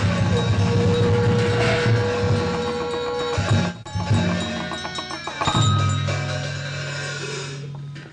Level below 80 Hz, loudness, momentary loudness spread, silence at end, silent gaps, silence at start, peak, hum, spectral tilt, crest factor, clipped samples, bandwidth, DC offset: -44 dBFS; -22 LUFS; 10 LU; 0 s; none; 0 s; -8 dBFS; none; -5.5 dB/octave; 14 dB; under 0.1%; 10 kHz; under 0.1%